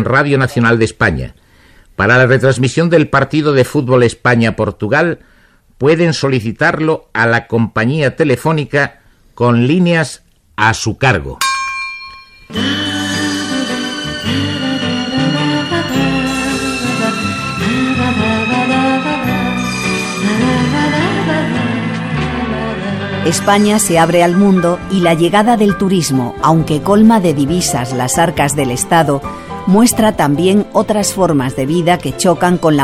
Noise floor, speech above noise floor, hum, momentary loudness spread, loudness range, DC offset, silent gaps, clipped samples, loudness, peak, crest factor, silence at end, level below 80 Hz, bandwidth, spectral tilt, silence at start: -44 dBFS; 33 dB; none; 7 LU; 4 LU; under 0.1%; none; under 0.1%; -13 LUFS; 0 dBFS; 12 dB; 0 s; -38 dBFS; 16 kHz; -5 dB/octave; 0 s